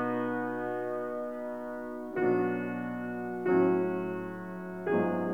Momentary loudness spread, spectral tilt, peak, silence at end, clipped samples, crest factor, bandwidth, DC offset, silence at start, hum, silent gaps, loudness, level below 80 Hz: 11 LU; -9 dB/octave; -16 dBFS; 0 s; under 0.1%; 16 dB; 5 kHz; 0.1%; 0 s; none; none; -32 LUFS; -68 dBFS